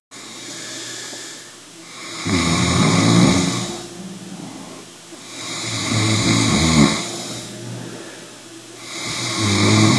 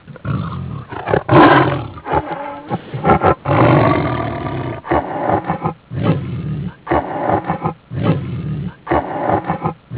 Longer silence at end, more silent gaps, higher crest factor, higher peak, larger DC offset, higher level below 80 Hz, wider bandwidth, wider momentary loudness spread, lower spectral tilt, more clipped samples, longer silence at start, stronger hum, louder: about the same, 0 s vs 0 s; neither; about the same, 20 dB vs 16 dB; about the same, 0 dBFS vs 0 dBFS; neither; second, -44 dBFS vs -36 dBFS; first, 12 kHz vs 4 kHz; first, 22 LU vs 13 LU; second, -4 dB/octave vs -11 dB/octave; neither; about the same, 0.1 s vs 0.05 s; neither; about the same, -18 LUFS vs -17 LUFS